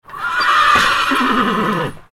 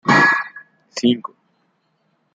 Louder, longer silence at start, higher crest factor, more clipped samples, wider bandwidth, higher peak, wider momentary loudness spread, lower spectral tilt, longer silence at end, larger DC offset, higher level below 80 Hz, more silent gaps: first, -14 LUFS vs -17 LUFS; about the same, 0.1 s vs 0.05 s; about the same, 14 dB vs 18 dB; neither; first, 18 kHz vs 9 kHz; about the same, -2 dBFS vs -2 dBFS; second, 9 LU vs 19 LU; about the same, -3.5 dB/octave vs -4.5 dB/octave; second, 0.1 s vs 1.05 s; neither; first, -44 dBFS vs -66 dBFS; neither